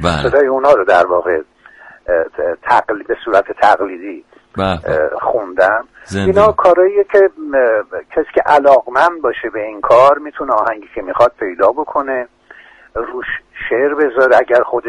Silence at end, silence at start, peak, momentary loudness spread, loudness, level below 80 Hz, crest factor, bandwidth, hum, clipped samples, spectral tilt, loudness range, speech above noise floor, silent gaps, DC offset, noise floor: 0 s; 0 s; 0 dBFS; 13 LU; -13 LUFS; -42 dBFS; 14 dB; 11 kHz; none; under 0.1%; -6 dB/octave; 5 LU; 28 dB; none; under 0.1%; -41 dBFS